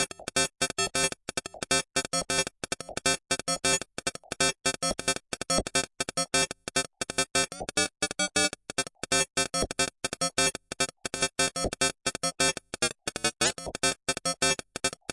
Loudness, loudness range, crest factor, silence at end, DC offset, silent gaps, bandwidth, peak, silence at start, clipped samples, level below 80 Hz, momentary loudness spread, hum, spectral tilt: -28 LUFS; 1 LU; 20 dB; 0 s; under 0.1%; none; 11.5 kHz; -10 dBFS; 0 s; under 0.1%; -52 dBFS; 6 LU; none; -1.5 dB/octave